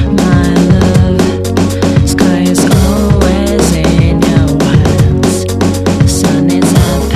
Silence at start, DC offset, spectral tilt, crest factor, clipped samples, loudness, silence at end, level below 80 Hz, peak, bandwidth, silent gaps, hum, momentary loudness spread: 0 s; under 0.1%; -6 dB/octave; 8 dB; 0.9%; -9 LUFS; 0 s; -18 dBFS; 0 dBFS; 14.5 kHz; none; none; 3 LU